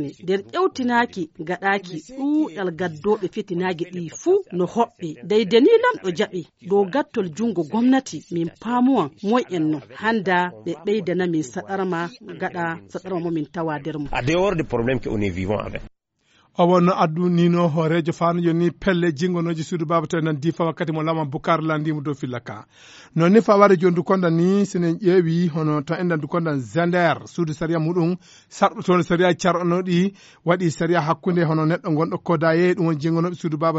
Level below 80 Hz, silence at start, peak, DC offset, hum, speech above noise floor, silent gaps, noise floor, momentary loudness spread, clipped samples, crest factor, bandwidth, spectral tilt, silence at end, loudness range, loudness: -50 dBFS; 0 s; 0 dBFS; under 0.1%; none; 42 dB; none; -62 dBFS; 10 LU; under 0.1%; 20 dB; 8 kHz; -6 dB/octave; 0 s; 5 LU; -21 LUFS